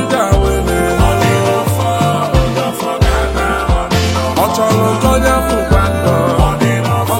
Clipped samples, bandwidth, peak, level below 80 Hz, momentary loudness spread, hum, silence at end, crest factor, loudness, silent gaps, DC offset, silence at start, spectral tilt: under 0.1%; 16.5 kHz; 0 dBFS; -20 dBFS; 3 LU; none; 0 s; 12 dB; -13 LUFS; none; under 0.1%; 0 s; -5.5 dB/octave